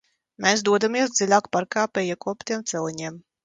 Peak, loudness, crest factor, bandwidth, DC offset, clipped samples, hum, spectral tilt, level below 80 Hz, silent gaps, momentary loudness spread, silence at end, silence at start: -4 dBFS; -23 LUFS; 20 dB; 9.6 kHz; under 0.1%; under 0.1%; none; -3 dB/octave; -68 dBFS; none; 11 LU; 0.25 s; 0.4 s